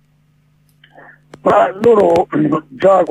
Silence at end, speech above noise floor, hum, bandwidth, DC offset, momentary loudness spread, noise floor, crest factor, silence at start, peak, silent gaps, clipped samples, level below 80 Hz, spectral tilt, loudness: 0 s; 42 dB; 50 Hz at -45 dBFS; 10 kHz; under 0.1%; 6 LU; -55 dBFS; 14 dB; 1.45 s; 0 dBFS; none; under 0.1%; -50 dBFS; -7.5 dB/octave; -13 LUFS